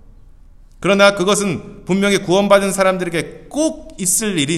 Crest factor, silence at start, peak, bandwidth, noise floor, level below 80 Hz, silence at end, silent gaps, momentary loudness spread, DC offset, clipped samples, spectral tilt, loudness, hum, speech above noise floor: 16 dB; 0.8 s; 0 dBFS; 14.5 kHz; -42 dBFS; -44 dBFS; 0 s; none; 11 LU; under 0.1%; under 0.1%; -3.5 dB/octave; -16 LUFS; none; 26 dB